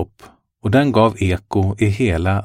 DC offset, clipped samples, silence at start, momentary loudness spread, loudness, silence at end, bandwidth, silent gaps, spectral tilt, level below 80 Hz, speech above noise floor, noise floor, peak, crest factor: under 0.1%; under 0.1%; 0 s; 7 LU; -17 LUFS; 0 s; 11 kHz; none; -7.5 dB/octave; -36 dBFS; 32 dB; -47 dBFS; -2 dBFS; 16 dB